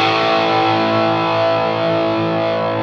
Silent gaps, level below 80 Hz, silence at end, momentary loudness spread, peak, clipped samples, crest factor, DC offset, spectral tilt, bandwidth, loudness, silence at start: none; -56 dBFS; 0 s; 3 LU; -4 dBFS; under 0.1%; 12 dB; under 0.1%; -6 dB/octave; 7.6 kHz; -16 LUFS; 0 s